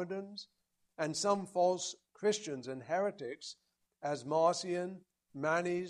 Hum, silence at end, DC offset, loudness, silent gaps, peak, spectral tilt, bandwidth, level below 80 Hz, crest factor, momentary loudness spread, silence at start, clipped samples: none; 0 s; under 0.1%; -36 LUFS; none; -16 dBFS; -4 dB/octave; 12.5 kHz; -82 dBFS; 20 dB; 17 LU; 0 s; under 0.1%